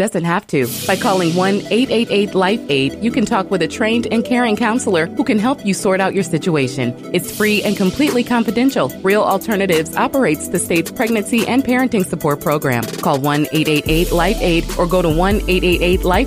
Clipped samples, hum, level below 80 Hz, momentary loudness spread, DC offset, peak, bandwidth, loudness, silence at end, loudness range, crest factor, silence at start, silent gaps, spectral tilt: under 0.1%; none; -30 dBFS; 3 LU; under 0.1%; -2 dBFS; 16 kHz; -16 LUFS; 0 s; 1 LU; 14 dB; 0 s; none; -5 dB/octave